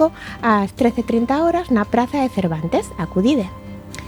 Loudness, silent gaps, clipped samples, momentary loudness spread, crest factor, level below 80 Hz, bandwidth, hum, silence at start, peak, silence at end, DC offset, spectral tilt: -19 LUFS; none; under 0.1%; 6 LU; 16 dB; -42 dBFS; 19 kHz; none; 0 s; -4 dBFS; 0 s; under 0.1%; -6.5 dB/octave